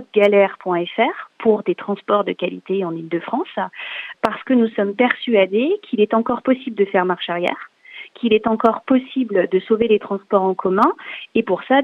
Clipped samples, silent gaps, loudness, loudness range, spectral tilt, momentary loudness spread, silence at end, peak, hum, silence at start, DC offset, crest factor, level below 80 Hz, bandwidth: under 0.1%; none; -19 LUFS; 3 LU; -7.5 dB/octave; 9 LU; 0 s; -2 dBFS; none; 0 s; under 0.1%; 16 dB; -64 dBFS; 5.6 kHz